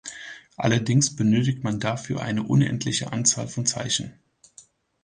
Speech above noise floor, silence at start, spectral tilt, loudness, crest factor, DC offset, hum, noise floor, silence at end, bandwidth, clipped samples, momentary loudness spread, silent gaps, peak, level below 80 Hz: 31 dB; 0.05 s; -4 dB/octave; -23 LUFS; 20 dB; under 0.1%; none; -54 dBFS; 0.9 s; 10 kHz; under 0.1%; 8 LU; none; -6 dBFS; -56 dBFS